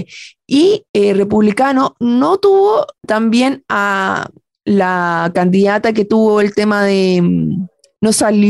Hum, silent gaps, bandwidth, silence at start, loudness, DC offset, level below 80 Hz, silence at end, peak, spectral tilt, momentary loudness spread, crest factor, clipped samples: none; 0.89-0.94 s; 12.5 kHz; 0 s; -13 LUFS; under 0.1%; -52 dBFS; 0 s; -4 dBFS; -5.5 dB/octave; 7 LU; 10 dB; under 0.1%